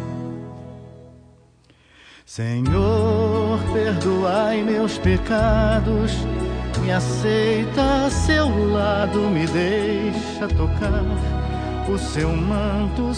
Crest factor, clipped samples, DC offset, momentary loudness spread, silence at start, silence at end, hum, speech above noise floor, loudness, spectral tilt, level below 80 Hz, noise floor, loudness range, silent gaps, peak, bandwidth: 16 dB; under 0.1%; under 0.1%; 7 LU; 0 s; 0 s; none; 34 dB; -21 LUFS; -6.5 dB/octave; -28 dBFS; -54 dBFS; 3 LU; none; -6 dBFS; 10 kHz